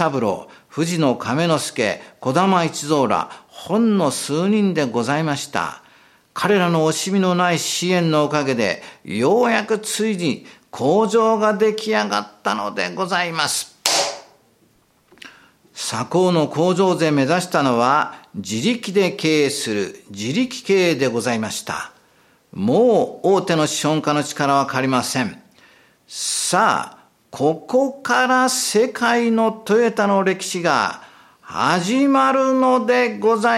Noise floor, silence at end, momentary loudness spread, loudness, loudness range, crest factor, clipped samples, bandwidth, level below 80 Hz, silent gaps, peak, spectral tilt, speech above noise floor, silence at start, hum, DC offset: -58 dBFS; 0 s; 9 LU; -19 LUFS; 3 LU; 20 dB; under 0.1%; 16.5 kHz; -66 dBFS; none; 0 dBFS; -4.5 dB/octave; 40 dB; 0 s; none; under 0.1%